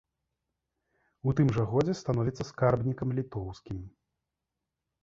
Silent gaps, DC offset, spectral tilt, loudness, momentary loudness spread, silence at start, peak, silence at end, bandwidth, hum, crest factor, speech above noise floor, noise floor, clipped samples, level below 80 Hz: none; under 0.1%; -8 dB/octave; -30 LUFS; 13 LU; 1.25 s; -10 dBFS; 1.15 s; 7.6 kHz; none; 20 dB; 58 dB; -87 dBFS; under 0.1%; -54 dBFS